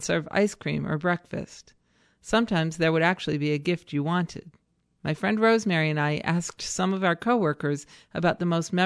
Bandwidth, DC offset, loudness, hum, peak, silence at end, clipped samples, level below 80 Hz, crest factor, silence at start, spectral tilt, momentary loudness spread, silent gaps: 11 kHz; under 0.1%; -26 LUFS; none; -8 dBFS; 0 s; under 0.1%; -58 dBFS; 18 dB; 0 s; -5.5 dB/octave; 12 LU; none